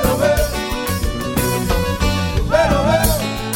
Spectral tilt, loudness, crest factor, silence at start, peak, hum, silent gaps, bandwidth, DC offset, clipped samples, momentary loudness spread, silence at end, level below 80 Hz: -5 dB/octave; -18 LUFS; 14 dB; 0 s; -2 dBFS; none; none; 17 kHz; under 0.1%; under 0.1%; 6 LU; 0 s; -24 dBFS